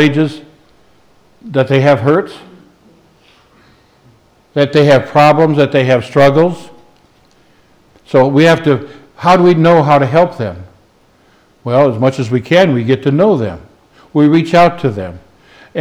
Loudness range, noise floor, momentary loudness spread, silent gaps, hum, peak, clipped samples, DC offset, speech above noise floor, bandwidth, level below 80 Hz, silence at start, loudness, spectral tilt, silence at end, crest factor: 6 LU; -50 dBFS; 14 LU; none; none; 0 dBFS; under 0.1%; under 0.1%; 40 dB; 13 kHz; -50 dBFS; 0 s; -11 LUFS; -7.5 dB/octave; 0 s; 12 dB